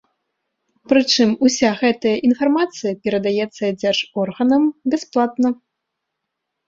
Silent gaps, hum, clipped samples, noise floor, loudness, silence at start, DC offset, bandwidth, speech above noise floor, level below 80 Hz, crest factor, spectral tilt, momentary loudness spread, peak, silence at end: none; none; under 0.1%; -78 dBFS; -18 LUFS; 0.9 s; under 0.1%; 7.8 kHz; 61 dB; -62 dBFS; 18 dB; -4 dB/octave; 7 LU; -2 dBFS; 1.15 s